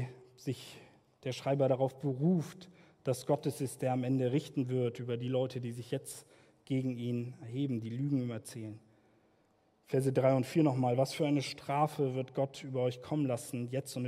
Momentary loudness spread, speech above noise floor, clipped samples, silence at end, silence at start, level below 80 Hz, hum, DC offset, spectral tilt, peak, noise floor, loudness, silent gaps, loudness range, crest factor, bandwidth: 14 LU; 38 dB; under 0.1%; 0 s; 0 s; -76 dBFS; none; under 0.1%; -7 dB/octave; -16 dBFS; -71 dBFS; -34 LUFS; none; 6 LU; 18 dB; 15 kHz